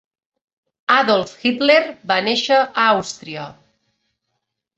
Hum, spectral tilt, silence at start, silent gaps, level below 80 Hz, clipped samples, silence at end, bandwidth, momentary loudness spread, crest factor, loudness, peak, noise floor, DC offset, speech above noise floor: none; -3.5 dB/octave; 0.9 s; none; -64 dBFS; under 0.1%; 1.25 s; 8.2 kHz; 15 LU; 20 dB; -16 LUFS; 0 dBFS; -76 dBFS; under 0.1%; 59 dB